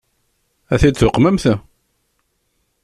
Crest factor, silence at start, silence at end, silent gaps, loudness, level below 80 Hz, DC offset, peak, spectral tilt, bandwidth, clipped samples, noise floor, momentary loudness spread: 16 dB; 0.7 s; 1.25 s; none; -15 LUFS; -32 dBFS; under 0.1%; -2 dBFS; -6.5 dB/octave; 13 kHz; under 0.1%; -67 dBFS; 8 LU